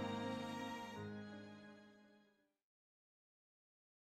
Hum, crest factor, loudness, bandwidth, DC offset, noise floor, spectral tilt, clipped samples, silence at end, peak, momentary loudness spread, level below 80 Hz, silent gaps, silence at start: none; 18 dB; -49 LUFS; 15 kHz; under 0.1%; -77 dBFS; -5.5 dB/octave; under 0.1%; 1.95 s; -32 dBFS; 19 LU; -86 dBFS; none; 0 s